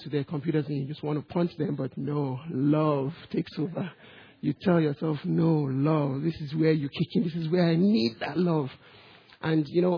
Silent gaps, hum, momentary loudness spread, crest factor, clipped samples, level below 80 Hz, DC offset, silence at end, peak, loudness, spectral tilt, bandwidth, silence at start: none; none; 8 LU; 16 dB; under 0.1%; -64 dBFS; under 0.1%; 0 s; -10 dBFS; -28 LUFS; -9.5 dB/octave; 5.4 kHz; 0 s